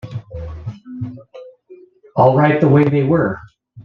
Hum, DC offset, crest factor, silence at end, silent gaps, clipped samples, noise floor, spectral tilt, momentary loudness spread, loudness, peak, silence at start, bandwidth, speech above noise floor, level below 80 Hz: none; under 0.1%; 16 dB; 0.05 s; none; under 0.1%; -44 dBFS; -10 dB/octave; 19 LU; -14 LUFS; -2 dBFS; 0.05 s; 5.4 kHz; 32 dB; -44 dBFS